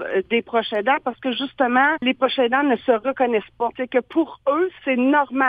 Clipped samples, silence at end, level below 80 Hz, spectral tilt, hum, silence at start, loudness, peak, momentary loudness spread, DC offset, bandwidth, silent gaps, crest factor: under 0.1%; 0 s; -62 dBFS; -6.5 dB/octave; none; 0 s; -20 LUFS; -4 dBFS; 6 LU; under 0.1%; 5 kHz; none; 16 dB